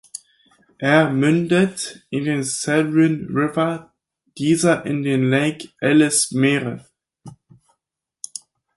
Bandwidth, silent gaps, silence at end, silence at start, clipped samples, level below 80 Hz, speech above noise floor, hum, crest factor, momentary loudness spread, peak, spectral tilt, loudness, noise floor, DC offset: 12 kHz; none; 1.45 s; 0.15 s; under 0.1%; -60 dBFS; 61 dB; none; 18 dB; 17 LU; -2 dBFS; -5 dB/octave; -19 LUFS; -79 dBFS; under 0.1%